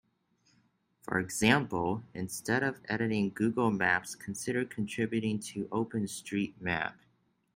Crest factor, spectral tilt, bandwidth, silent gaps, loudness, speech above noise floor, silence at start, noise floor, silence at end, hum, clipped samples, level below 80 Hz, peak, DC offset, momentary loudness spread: 22 dB; -5 dB/octave; 16 kHz; none; -32 LUFS; 40 dB; 1.05 s; -72 dBFS; 0.65 s; none; under 0.1%; -66 dBFS; -10 dBFS; under 0.1%; 10 LU